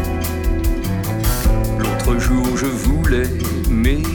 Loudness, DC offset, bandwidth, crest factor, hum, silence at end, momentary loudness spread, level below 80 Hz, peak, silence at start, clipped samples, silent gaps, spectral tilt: -19 LUFS; under 0.1%; over 20 kHz; 12 dB; none; 0 s; 4 LU; -20 dBFS; -4 dBFS; 0 s; under 0.1%; none; -6 dB/octave